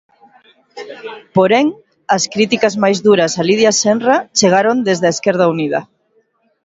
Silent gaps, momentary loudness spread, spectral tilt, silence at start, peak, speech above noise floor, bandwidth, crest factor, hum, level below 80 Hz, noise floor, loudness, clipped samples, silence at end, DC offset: none; 16 LU; -4 dB/octave; 0.75 s; 0 dBFS; 46 dB; 8 kHz; 14 dB; none; -60 dBFS; -59 dBFS; -13 LUFS; under 0.1%; 0.8 s; under 0.1%